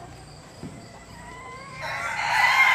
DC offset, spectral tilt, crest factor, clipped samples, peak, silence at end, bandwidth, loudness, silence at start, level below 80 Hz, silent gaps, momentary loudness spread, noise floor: under 0.1%; -2 dB/octave; 20 dB; under 0.1%; -6 dBFS; 0 s; 15.5 kHz; -22 LUFS; 0 s; -54 dBFS; none; 24 LU; -44 dBFS